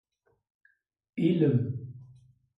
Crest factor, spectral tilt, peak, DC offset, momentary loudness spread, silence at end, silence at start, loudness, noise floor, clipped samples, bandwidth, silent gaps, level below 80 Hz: 18 dB; -10.5 dB/octave; -12 dBFS; under 0.1%; 21 LU; 0.55 s; 1.15 s; -28 LUFS; -58 dBFS; under 0.1%; 5.2 kHz; none; -68 dBFS